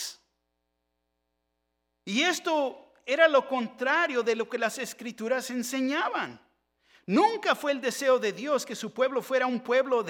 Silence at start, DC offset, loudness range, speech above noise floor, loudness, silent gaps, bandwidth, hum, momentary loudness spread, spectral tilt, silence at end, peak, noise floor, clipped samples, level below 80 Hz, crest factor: 0 s; under 0.1%; 3 LU; 53 dB; -27 LUFS; none; 17.5 kHz; none; 12 LU; -3 dB/octave; 0 s; -6 dBFS; -80 dBFS; under 0.1%; -82 dBFS; 22 dB